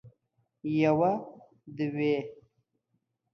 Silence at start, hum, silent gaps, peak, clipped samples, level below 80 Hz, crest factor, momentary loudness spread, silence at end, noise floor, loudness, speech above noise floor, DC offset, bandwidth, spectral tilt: 0.05 s; none; none; -12 dBFS; under 0.1%; -70 dBFS; 20 dB; 21 LU; 1 s; -79 dBFS; -29 LUFS; 51 dB; under 0.1%; 6.4 kHz; -8.5 dB/octave